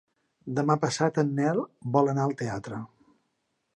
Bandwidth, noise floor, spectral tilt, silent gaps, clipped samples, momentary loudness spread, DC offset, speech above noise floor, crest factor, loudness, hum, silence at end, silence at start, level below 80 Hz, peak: 10.5 kHz; -77 dBFS; -6.5 dB/octave; none; under 0.1%; 14 LU; under 0.1%; 50 dB; 20 dB; -27 LUFS; none; 0.9 s; 0.45 s; -66 dBFS; -8 dBFS